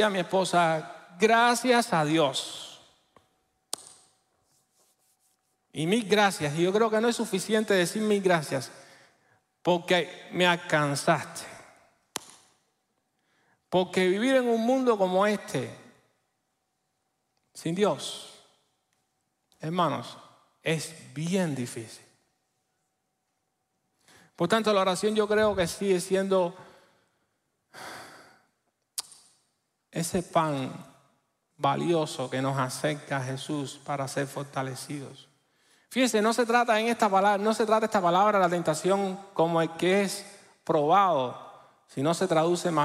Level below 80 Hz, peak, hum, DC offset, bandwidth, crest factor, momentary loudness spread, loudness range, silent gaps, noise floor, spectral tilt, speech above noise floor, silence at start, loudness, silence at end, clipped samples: -68 dBFS; -8 dBFS; none; under 0.1%; 16 kHz; 20 dB; 16 LU; 10 LU; none; -78 dBFS; -4.5 dB/octave; 53 dB; 0 s; -26 LUFS; 0 s; under 0.1%